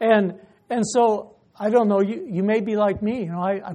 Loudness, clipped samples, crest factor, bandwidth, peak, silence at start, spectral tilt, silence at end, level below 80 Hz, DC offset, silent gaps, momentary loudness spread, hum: -22 LUFS; under 0.1%; 16 dB; 10 kHz; -6 dBFS; 0 s; -6 dB/octave; 0 s; -58 dBFS; under 0.1%; none; 9 LU; none